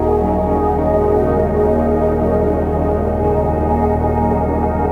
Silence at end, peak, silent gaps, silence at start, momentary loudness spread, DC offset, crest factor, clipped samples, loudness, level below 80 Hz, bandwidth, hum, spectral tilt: 0 s; -4 dBFS; none; 0 s; 2 LU; under 0.1%; 12 dB; under 0.1%; -16 LUFS; -24 dBFS; 4.3 kHz; none; -10.5 dB/octave